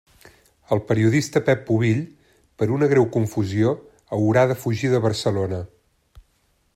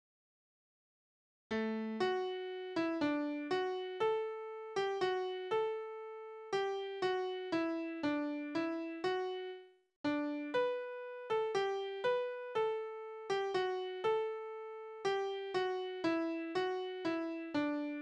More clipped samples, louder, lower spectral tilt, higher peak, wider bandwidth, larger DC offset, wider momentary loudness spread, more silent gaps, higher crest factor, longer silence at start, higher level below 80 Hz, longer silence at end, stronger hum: neither; first, -21 LUFS vs -38 LUFS; first, -7 dB/octave vs -5 dB/octave; first, -4 dBFS vs -22 dBFS; first, 14.5 kHz vs 9.2 kHz; neither; about the same, 10 LU vs 8 LU; second, none vs 9.96-10.04 s; about the same, 18 dB vs 16 dB; second, 0.7 s vs 1.5 s; first, -56 dBFS vs -80 dBFS; first, 0.55 s vs 0 s; neither